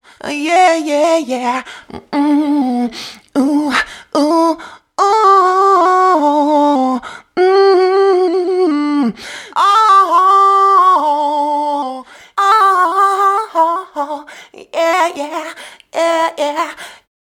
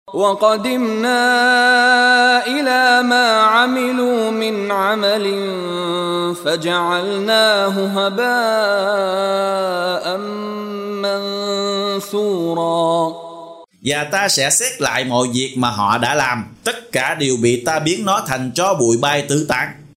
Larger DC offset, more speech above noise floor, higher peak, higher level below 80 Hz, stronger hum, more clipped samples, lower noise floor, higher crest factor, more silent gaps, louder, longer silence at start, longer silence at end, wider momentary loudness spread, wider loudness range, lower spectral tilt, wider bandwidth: neither; about the same, 22 dB vs 20 dB; about the same, 0 dBFS vs -2 dBFS; about the same, -60 dBFS vs -58 dBFS; neither; neither; about the same, -36 dBFS vs -37 dBFS; about the same, 12 dB vs 14 dB; neither; first, -12 LUFS vs -16 LUFS; first, 0.25 s vs 0.1 s; first, 0.4 s vs 0.1 s; first, 15 LU vs 9 LU; about the same, 5 LU vs 7 LU; about the same, -3.5 dB/octave vs -3 dB/octave; about the same, 16.5 kHz vs 16 kHz